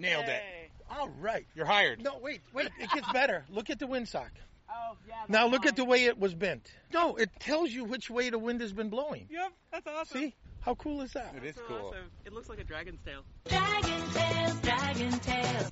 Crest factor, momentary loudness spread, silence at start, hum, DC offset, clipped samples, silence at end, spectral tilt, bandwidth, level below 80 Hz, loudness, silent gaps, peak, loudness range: 22 dB; 18 LU; 0 s; none; under 0.1%; under 0.1%; 0 s; -2.5 dB/octave; 8 kHz; -52 dBFS; -32 LUFS; none; -12 dBFS; 10 LU